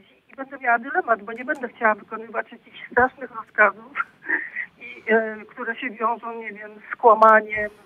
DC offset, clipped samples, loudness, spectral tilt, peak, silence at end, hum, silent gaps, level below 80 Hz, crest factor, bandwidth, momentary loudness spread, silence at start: under 0.1%; under 0.1%; -22 LUFS; -6 dB/octave; -2 dBFS; 0.15 s; none; none; -62 dBFS; 22 dB; 7.6 kHz; 18 LU; 0.4 s